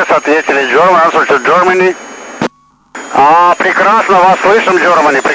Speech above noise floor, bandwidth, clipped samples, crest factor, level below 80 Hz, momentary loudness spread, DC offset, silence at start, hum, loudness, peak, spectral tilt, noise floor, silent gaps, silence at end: 27 dB; 8 kHz; under 0.1%; 8 dB; -52 dBFS; 12 LU; under 0.1%; 0 s; none; -8 LUFS; 0 dBFS; -4 dB/octave; -34 dBFS; none; 0 s